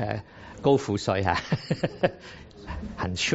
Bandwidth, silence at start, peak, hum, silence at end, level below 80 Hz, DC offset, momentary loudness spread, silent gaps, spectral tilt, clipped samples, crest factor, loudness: 8 kHz; 0 s; -6 dBFS; none; 0 s; -48 dBFS; under 0.1%; 20 LU; none; -4.5 dB/octave; under 0.1%; 22 dB; -27 LUFS